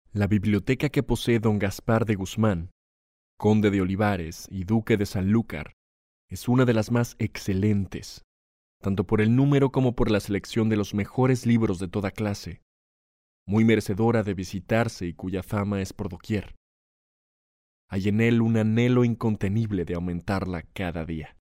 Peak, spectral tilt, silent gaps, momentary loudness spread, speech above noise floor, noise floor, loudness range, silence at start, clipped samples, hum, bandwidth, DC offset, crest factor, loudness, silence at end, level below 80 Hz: -8 dBFS; -7 dB/octave; 2.71-3.38 s, 5.73-6.28 s, 8.24-8.80 s, 12.62-13.46 s, 16.57-17.88 s; 12 LU; over 66 dB; under -90 dBFS; 4 LU; 0.15 s; under 0.1%; none; 16 kHz; under 0.1%; 16 dB; -25 LUFS; 0.25 s; -46 dBFS